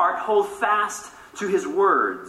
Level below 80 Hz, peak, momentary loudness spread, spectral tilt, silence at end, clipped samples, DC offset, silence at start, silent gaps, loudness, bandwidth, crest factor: -64 dBFS; -8 dBFS; 13 LU; -3.5 dB/octave; 0 s; under 0.1%; under 0.1%; 0 s; none; -22 LUFS; 13.5 kHz; 16 dB